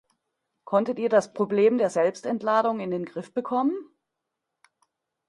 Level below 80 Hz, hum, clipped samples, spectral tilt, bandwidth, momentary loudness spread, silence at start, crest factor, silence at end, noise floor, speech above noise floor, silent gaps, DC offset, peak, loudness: -74 dBFS; none; under 0.1%; -6 dB/octave; 11.5 kHz; 10 LU; 0.65 s; 20 dB; 1.45 s; -83 dBFS; 59 dB; none; under 0.1%; -6 dBFS; -25 LUFS